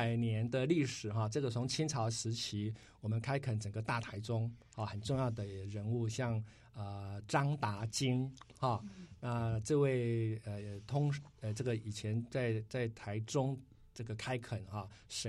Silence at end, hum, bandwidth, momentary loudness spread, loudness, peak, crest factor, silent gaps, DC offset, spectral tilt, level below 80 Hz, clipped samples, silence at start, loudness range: 0 s; none; 12.5 kHz; 11 LU; -38 LUFS; -18 dBFS; 20 dB; none; under 0.1%; -5.5 dB/octave; -64 dBFS; under 0.1%; 0 s; 3 LU